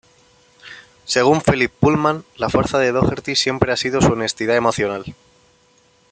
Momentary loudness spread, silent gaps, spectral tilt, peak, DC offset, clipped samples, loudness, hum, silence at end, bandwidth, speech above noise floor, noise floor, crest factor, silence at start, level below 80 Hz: 17 LU; none; -5 dB/octave; 0 dBFS; under 0.1%; under 0.1%; -18 LUFS; none; 1 s; 9.6 kHz; 38 dB; -56 dBFS; 20 dB; 0.65 s; -44 dBFS